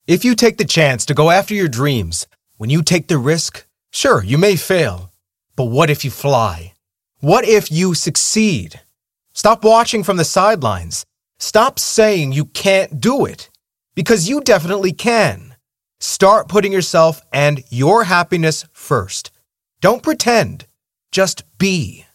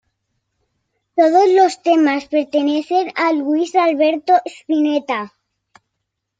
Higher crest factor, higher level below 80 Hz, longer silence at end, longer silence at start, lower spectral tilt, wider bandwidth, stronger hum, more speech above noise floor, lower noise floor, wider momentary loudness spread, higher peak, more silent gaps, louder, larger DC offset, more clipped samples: about the same, 14 dB vs 16 dB; first, -46 dBFS vs -70 dBFS; second, 0.2 s vs 1.1 s; second, 0.1 s vs 1.15 s; about the same, -4.5 dB/octave vs -3.5 dB/octave; first, 16.5 kHz vs 9.2 kHz; neither; second, 49 dB vs 61 dB; second, -64 dBFS vs -76 dBFS; first, 12 LU vs 8 LU; about the same, 0 dBFS vs -2 dBFS; neither; about the same, -15 LUFS vs -16 LUFS; neither; neither